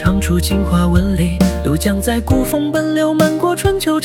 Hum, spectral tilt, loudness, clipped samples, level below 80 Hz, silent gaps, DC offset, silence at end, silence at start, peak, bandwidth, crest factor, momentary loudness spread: none; -6 dB/octave; -15 LUFS; under 0.1%; -24 dBFS; none; 0.2%; 0 s; 0 s; 0 dBFS; 18.5 kHz; 14 dB; 3 LU